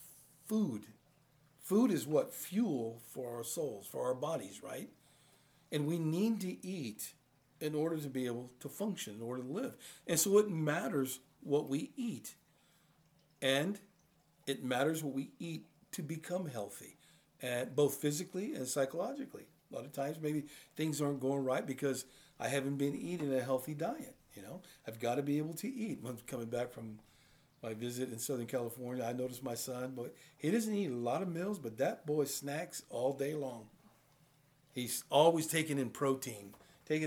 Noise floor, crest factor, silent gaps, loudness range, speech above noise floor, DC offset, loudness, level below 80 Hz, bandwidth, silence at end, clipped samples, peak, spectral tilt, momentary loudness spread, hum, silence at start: -71 dBFS; 24 dB; none; 5 LU; 34 dB; under 0.1%; -37 LUFS; -80 dBFS; over 20 kHz; 0 s; under 0.1%; -14 dBFS; -5 dB/octave; 14 LU; none; 0 s